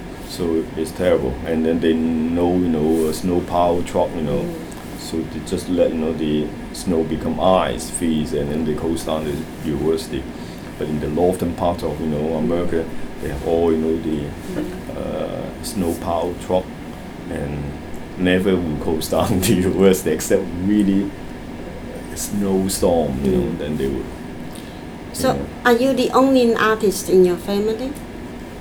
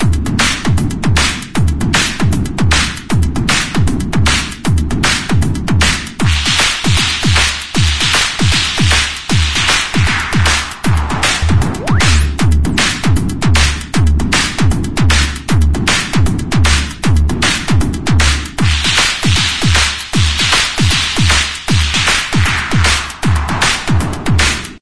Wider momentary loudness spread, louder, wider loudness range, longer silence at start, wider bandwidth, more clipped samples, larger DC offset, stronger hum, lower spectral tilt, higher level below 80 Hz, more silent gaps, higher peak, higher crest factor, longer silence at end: first, 15 LU vs 4 LU; second, -20 LUFS vs -12 LUFS; first, 5 LU vs 2 LU; about the same, 0 s vs 0 s; first, over 20 kHz vs 11 kHz; neither; second, under 0.1% vs 6%; neither; first, -5.5 dB/octave vs -3.5 dB/octave; second, -38 dBFS vs -20 dBFS; neither; about the same, -2 dBFS vs 0 dBFS; about the same, 18 dB vs 14 dB; about the same, 0 s vs 0 s